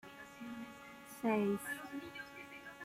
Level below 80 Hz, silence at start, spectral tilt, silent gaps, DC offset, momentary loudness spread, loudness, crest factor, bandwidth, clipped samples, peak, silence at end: -76 dBFS; 0.05 s; -5.5 dB/octave; none; under 0.1%; 17 LU; -41 LUFS; 20 dB; 16 kHz; under 0.1%; -22 dBFS; 0 s